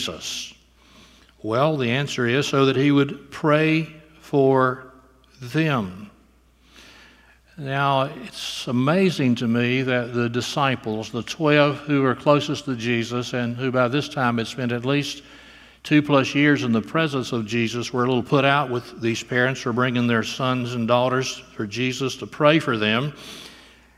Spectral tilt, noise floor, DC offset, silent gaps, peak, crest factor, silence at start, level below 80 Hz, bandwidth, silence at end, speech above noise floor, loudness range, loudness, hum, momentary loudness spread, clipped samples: -5.5 dB/octave; -56 dBFS; under 0.1%; none; 0 dBFS; 22 dB; 0 s; -58 dBFS; 14.5 kHz; 0.4 s; 35 dB; 4 LU; -22 LUFS; none; 11 LU; under 0.1%